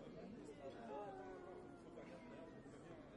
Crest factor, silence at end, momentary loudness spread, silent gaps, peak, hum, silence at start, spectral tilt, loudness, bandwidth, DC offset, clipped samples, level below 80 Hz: 16 dB; 0 s; 6 LU; none; -40 dBFS; none; 0 s; -6.5 dB/octave; -56 LUFS; 10.5 kHz; under 0.1%; under 0.1%; -74 dBFS